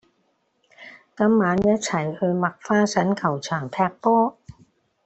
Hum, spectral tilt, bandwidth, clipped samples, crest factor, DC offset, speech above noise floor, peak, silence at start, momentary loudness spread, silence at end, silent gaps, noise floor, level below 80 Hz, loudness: none; -6 dB/octave; 8.4 kHz; under 0.1%; 16 dB; under 0.1%; 47 dB; -6 dBFS; 0.8 s; 7 LU; 0.75 s; none; -68 dBFS; -56 dBFS; -22 LUFS